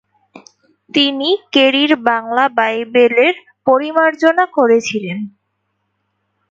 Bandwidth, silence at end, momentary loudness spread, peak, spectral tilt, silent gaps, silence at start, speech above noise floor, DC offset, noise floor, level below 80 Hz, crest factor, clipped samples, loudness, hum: 7.8 kHz; 1.2 s; 9 LU; 0 dBFS; -4 dB/octave; none; 0.35 s; 56 dB; under 0.1%; -69 dBFS; -66 dBFS; 16 dB; under 0.1%; -14 LUFS; none